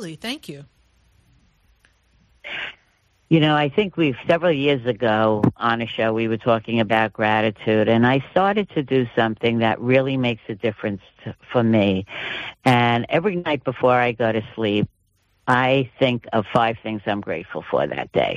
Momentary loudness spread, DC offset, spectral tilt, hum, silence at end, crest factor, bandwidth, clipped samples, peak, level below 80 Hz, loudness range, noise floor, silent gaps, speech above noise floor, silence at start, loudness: 12 LU; under 0.1%; -7 dB/octave; none; 0 s; 16 dB; 12.5 kHz; under 0.1%; -4 dBFS; -56 dBFS; 3 LU; -64 dBFS; none; 44 dB; 0 s; -20 LUFS